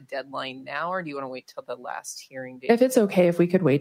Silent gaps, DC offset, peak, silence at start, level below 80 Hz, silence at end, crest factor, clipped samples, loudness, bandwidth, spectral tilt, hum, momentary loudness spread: none; under 0.1%; -6 dBFS; 0.1 s; -72 dBFS; 0 s; 20 dB; under 0.1%; -24 LUFS; 16 kHz; -6 dB/octave; none; 17 LU